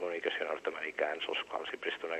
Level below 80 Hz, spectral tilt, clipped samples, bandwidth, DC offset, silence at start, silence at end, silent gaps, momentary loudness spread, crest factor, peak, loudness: -78 dBFS; -2.5 dB/octave; under 0.1%; 12.5 kHz; under 0.1%; 0 s; 0 s; none; 3 LU; 18 dB; -18 dBFS; -36 LUFS